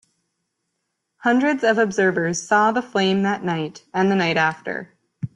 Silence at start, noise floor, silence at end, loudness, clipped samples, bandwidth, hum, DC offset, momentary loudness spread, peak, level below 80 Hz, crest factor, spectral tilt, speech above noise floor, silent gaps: 1.2 s; -76 dBFS; 0.1 s; -20 LUFS; under 0.1%; 10.5 kHz; none; under 0.1%; 10 LU; -4 dBFS; -64 dBFS; 16 dB; -5 dB/octave; 57 dB; none